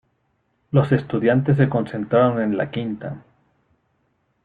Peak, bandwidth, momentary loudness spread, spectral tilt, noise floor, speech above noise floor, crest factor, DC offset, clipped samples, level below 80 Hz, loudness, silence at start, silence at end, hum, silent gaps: -2 dBFS; 4.7 kHz; 12 LU; -10 dB/octave; -68 dBFS; 49 dB; 18 dB; under 0.1%; under 0.1%; -56 dBFS; -20 LUFS; 0.75 s; 1.25 s; none; none